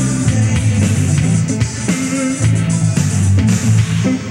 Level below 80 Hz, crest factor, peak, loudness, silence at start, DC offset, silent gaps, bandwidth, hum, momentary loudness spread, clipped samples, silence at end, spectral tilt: -34 dBFS; 12 dB; -2 dBFS; -15 LUFS; 0 s; under 0.1%; none; 12.5 kHz; none; 4 LU; under 0.1%; 0 s; -5.5 dB/octave